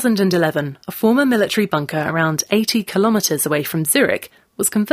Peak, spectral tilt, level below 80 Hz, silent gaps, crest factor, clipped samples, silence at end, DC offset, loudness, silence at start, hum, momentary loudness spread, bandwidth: -2 dBFS; -4 dB/octave; -58 dBFS; none; 16 dB; under 0.1%; 0 s; under 0.1%; -18 LUFS; 0 s; none; 5 LU; 16 kHz